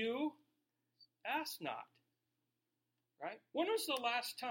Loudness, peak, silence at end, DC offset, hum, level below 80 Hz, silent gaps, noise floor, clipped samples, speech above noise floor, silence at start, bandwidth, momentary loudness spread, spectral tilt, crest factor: -41 LUFS; -24 dBFS; 0 s; under 0.1%; none; under -90 dBFS; none; -88 dBFS; under 0.1%; 47 dB; 0 s; 16.5 kHz; 13 LU; -2.5 dB/octave; 18 dB